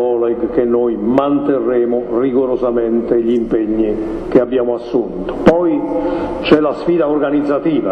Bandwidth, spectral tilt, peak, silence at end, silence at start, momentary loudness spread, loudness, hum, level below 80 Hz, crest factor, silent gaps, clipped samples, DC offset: 6.4 kHz; -8 dB/octave; 0 dBFS; 0 s; 0 s; 5 LU; -15 LUFS; none; -38 dBFS; 14 dB; none; 0.2%; under 0.1%